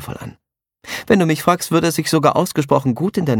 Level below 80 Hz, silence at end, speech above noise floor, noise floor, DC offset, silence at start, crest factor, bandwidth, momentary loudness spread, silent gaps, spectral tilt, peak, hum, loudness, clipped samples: -52 dBFS; 0 s; 23 dB; -39 dBFS; under 0.1%; 0 s; 16 dB; 18.5 kHz; 15 LU; none; -5.5 dB/octave; 0 dBFS; none; -16 LUFS; under 0.1%